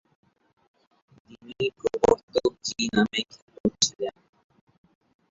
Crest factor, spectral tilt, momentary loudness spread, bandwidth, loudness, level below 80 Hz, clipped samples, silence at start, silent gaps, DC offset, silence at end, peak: 24 dB; -3 dB/octave; 12 LU; 8 kHz; -26 LUFS; -56 dBFS; under 0.1%; 1.45 s; 2.23-2.28 s, 3.42-3.48 s, 3.60-3.64 s; under 0.1%; 1.2 s; -4 dBFS